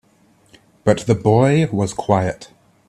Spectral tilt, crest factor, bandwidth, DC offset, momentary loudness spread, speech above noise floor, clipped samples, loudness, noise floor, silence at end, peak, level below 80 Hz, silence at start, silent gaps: -7 dB/octave; 18 dB; 12 kHz; under 0.1%; 9 LU; 39 dB; under 0.1%; -17 LUFS; -55 dBFS; 0.45 s; 0 dBFS; -50 dBFS; 0.85 s; none